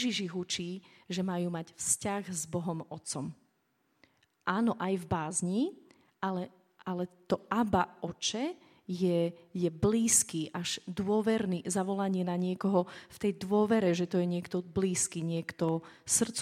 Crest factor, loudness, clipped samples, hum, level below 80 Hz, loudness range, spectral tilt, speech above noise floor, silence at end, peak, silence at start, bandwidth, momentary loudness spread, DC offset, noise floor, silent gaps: 20 dB; -32 LUFS; under 0.1%; none; -62 dBFS; 5 LU; -4.5 dB/octave; 43 dB; 0 s; -12 dBFS; 0 s; 15.5 kHz; 10 LU; under 0.1%; -75 dBFS; none